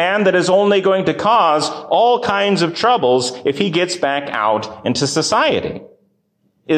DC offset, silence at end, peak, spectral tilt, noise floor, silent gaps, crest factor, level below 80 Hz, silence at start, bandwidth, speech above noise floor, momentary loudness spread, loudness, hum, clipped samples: under 0.1%; 0 s; -4 dBFS; -4 dB/octave; -63 dBFS; none; 12 dB; -54 dBFS; 0 s; 9.8 kHz; 48 dB; 6 LU; -15 LUFS; none; under 0.1%